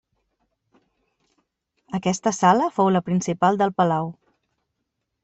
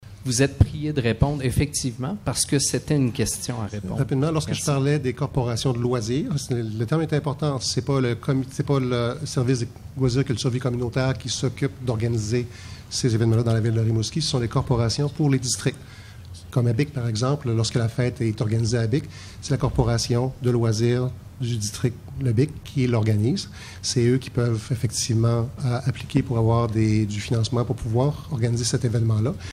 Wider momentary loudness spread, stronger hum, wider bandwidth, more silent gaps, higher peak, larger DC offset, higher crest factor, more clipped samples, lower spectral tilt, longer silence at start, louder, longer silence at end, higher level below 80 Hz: about the same, 8 LU vs 6 LU; neither; second, 8.2 kHz vs 14 kHz; neither; about the same, -4 dBFS vs -4 dBFS; neither; about the same, 20 dB vs 18 dB; neither; about the same, -5.5 dB/octave vs -5.5 dB/octave; first, 1.9 s vs 0 s; first, -21 LUFS vs -24 LUFS; first, 1.1 s vs 0 s; second, -64 dBFS vs -42 dBFS